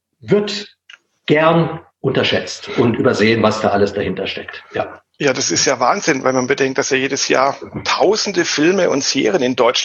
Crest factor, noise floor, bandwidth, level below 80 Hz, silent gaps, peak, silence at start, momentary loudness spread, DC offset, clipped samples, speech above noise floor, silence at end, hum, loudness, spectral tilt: 16 dB; -46 dBFS; 8.4 kHz; -56 dBFS; none; 0 dBFS; 0.25 s; 10 LU; under 0.1%; under 0.1%; 30 dB; 0 s; none; -16 LUFS; -4 dB/octave